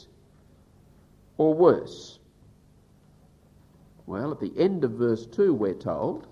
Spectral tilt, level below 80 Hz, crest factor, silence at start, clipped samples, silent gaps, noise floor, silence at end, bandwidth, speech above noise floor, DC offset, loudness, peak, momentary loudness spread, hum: -8 dB/octave; -60 dBFS; 22 dB; 1.4 s; under 0.1%; none; -58 dBFS; 0.1 s; 7.6 kHz; 33 dB; under 0.1%; -25 LUFS; -6 dBFS; 20 LU; 50 Hz at -60 dBFS